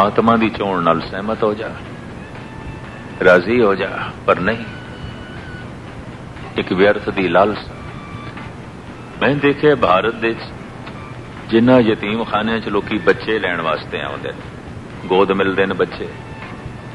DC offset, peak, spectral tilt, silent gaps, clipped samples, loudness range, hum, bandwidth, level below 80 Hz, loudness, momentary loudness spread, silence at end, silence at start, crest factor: under 0.1%; 0 dBFS; -7 dB/octave; none; under 0.1%; 4 LU; none; 11.5 kHz; -44 dBFS; -17 LUFS; 19 LU; 0 s; 0 s; 18 dB